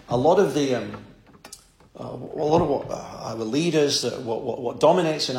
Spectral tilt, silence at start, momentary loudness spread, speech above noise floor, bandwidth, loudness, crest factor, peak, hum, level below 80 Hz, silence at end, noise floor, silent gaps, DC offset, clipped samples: -5 dB/octave; 0.1 s; 18 LU; 25 dB; 16.5 kHz; -23 LUFS; 18 dB; -6 dBFS; none; -54 dBFS; 0 s; -48 dBFS; none; under 0.1%; under 0.1%